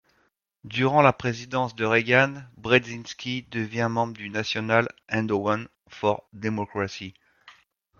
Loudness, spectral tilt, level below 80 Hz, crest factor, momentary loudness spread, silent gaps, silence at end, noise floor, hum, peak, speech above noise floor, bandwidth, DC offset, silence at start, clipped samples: -25 LUFS; -5.5 dB/octave; -62 dBFS; 22 dB; 12 LU; none; 0.5 s; -69 dBFS; none; -4 dBFS; 44 dB; 7.2 kHz; under 0.1%; 0.65 s; under 0.1%